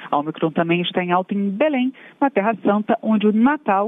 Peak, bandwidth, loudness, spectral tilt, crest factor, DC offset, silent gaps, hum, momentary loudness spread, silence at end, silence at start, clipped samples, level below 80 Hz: -6 dBFS; 3.9 kHz; -20 LUFS; -9 dB/octave; 14 dB; under 0.1%; none; none; 6 LU; 0 s; 0 s; under 0.1%; -66 dBFS